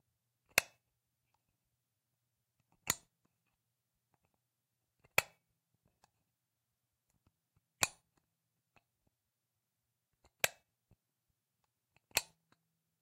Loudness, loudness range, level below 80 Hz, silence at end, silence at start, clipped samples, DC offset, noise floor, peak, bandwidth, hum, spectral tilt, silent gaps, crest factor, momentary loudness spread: -37 LUFS; 6 LU; -76 dBFS; 0.8 s; 0.55 s; under 0.1%; under 0.1%; -88 dBFS; -8 dBFS; 16 kHz; none; 0 dB/octave; none; 38 dB; 9 LU